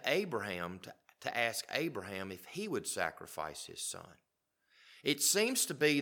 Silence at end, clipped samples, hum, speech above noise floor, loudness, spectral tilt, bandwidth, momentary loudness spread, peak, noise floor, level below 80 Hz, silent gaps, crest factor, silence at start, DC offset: 0 s; under 0.1%; none; 40 dB; -35 LUFS; -2.5 dB/octave; 19 kHz; 14 LU; -16 dBFS; -76 dBFS; -76 dBFS; none; 22 dB; 0 s; under 0.1%